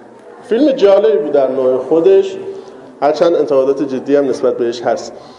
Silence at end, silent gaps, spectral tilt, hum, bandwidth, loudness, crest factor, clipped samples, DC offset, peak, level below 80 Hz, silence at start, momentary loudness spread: 0.05 s; none; -6 dB/octave; none; 9.6 kHz; -13 LUFS; 12 dB; under 0.1%; under 0.1%; 0 dBFS; -62 dBFS; 0.25 s; 10 LU